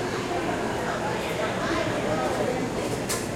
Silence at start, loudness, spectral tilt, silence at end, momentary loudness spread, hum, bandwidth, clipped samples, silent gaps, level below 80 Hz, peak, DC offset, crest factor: 0 s; -27 LUFS; -4.5 dB/octave; 0 s; 2 LU; none; 16.5 kHz; under 0.1%; none; -48 dBFS; -14 dBFS; under 0.1%; 14 dB